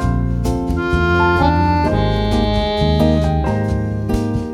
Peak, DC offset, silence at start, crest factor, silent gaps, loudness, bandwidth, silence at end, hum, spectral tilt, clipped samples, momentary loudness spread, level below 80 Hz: 0 dBFS; under 0.1%; 0 s; 16 dB; none; -17 LUFS; 14 kHz; 0 s; none; -7.5 dB/octave; under 0.1%; 5 LU; -24 dBFS